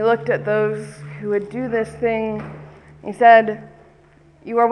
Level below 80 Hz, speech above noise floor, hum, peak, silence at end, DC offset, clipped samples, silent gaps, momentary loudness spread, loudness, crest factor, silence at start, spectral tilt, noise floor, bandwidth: -54 dBFS; 33 dB; none; 0 dBFS; 0 s; under 0.1%; under 0.1%; none; 22 LU; -18 LUFS; 18 dB; 0 s; -7 dB/octave; -51 dBFS; 10.5 kHz